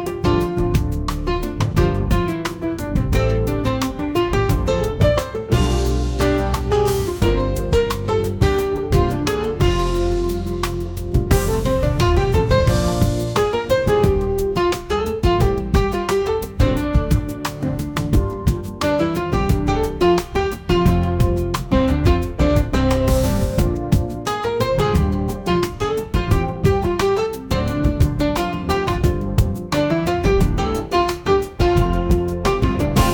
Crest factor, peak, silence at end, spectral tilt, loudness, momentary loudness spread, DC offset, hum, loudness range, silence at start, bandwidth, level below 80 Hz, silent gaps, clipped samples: 14 dB; -4 dBFS; 0 s; -6.5 dB/octave; -19 LUFS; 5 LU; under 0.1%; none; 2 LU; 0 s; 19.5 kHz; -24 dBFS; none; under 0.1%